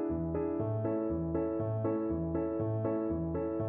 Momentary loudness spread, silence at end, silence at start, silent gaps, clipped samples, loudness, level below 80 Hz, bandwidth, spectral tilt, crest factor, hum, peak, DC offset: 1 LU; 0 s; 0 s; none; under 0.1%; -34 LUFS; -50 dBFS; 2.8 kHz; -12 dB/octave; 12 dB; none; -20 dBFS; under 0.1%